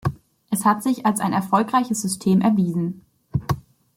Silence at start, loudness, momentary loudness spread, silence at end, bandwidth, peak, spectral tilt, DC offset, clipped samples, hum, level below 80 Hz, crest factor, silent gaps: 0.05 s; -22 LUFS; 11 LU; 0.35 s; 16.5 kHz; -4 dBFS; -6 dB/octave; under 0.1%; under 0.1%; none; -50 dBFS; 16 dB; none